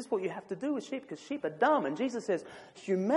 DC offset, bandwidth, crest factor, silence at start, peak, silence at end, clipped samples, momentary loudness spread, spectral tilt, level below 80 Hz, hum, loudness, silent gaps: under 0.1%; 11.5 kHz; 18 dB; 0 s; -16 dBFS; 0 s; under 0.1%; 13 LU; -6 dB/octave; -82 dBFS; none; -33 LUFS; none